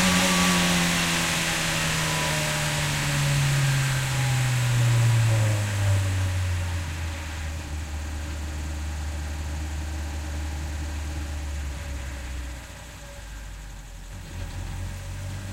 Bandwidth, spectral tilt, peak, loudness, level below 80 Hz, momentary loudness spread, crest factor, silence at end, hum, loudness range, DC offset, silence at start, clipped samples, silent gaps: 16 kHz; -4 dB/octave; -8 dBFS; -25 LUFS; -36 dBFS; 18 LU; 16 dB; 0 s; none; 14 LU; under 0.1%; 0 s; under 0.1%; none